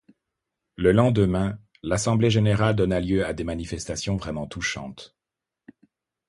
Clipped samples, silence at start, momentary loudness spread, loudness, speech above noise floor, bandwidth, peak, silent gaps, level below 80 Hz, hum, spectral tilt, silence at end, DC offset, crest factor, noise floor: under 0.1%; 0.8 s; 12 LU; -24 LUFS; 65 dB; 11.5 kHz; -4 dBFS; none; -44 dBFS; none; -6 dB/octave; 1.2 s; under 0.1%; 20 dB; -87 dBFS